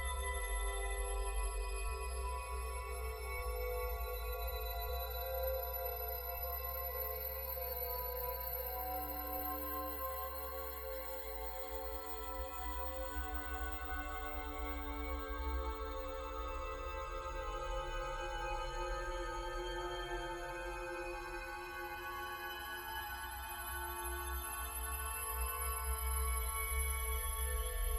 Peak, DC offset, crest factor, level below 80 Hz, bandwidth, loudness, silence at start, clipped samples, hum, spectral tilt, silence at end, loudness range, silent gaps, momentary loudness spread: -26 dBFS; under 0.1%; 14 dB; -44 dBFS; 19 kHz; -41 LUFS; 0 s; under 0.1%; none; -3.5 dB/octave; 0 s; 4 LU; none; 5 LU